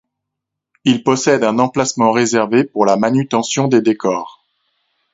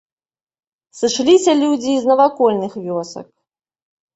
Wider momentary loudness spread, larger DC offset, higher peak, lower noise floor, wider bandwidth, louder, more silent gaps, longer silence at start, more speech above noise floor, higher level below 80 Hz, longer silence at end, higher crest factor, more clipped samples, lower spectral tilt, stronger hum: second, 5 LU vs 12 LU; neither; about the same, 0 dBFS vs -2 dBFS; second, -80 dBFS vs under -90 dBFS; about the same, 8 kHz vs 8.2 kHz; about the same, -15 LUFS vs -16 LUFS; neither; about the same, 0.85 s vs 0.95 s; second, 66 dB vs over 75 dB; about the same, -58 dBFS vs -62 dBFS; about the same, 0.85 s vs 0.9 s; about the same, 16 dB vs 16 dB; neither; about the same, -5 dB/octave vs -4 dB/octave; neither